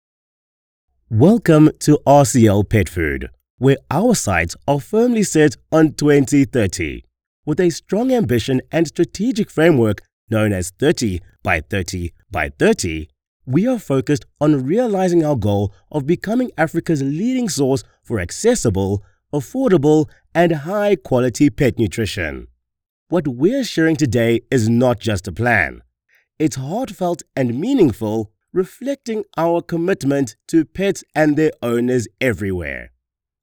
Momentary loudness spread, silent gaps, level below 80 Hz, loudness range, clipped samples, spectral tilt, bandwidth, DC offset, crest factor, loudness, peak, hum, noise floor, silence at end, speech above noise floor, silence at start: 10 LU; 3.50-3.58 s, 7.27-7.43 s, 10.13-10.27 s, 13.27-13.40 s, 22.89-23.06 s; -44 dBFS; 5 LU; under 0.1%; -6 dB/octave; over 20 kHz; under 0.1%; 16 dB; -18 LUFS; -2 dBFS; none; -61 dBFS; 0.55 s; 45 dB; 1.1 s